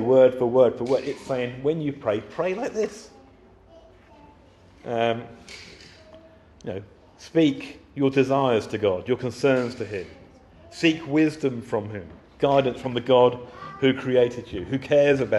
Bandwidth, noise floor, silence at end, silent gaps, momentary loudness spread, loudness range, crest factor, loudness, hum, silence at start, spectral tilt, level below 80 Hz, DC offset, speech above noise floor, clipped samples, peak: 11.5 kHz; -52 dBFS; 0 s; none; 19 LU; 10 LU; 18 dB; -23 LUFS; none; 0 s; -6.5 dB/octave; -56 dBFS; under 0.1%; 30 dB; under 0.1%; -6 dBFS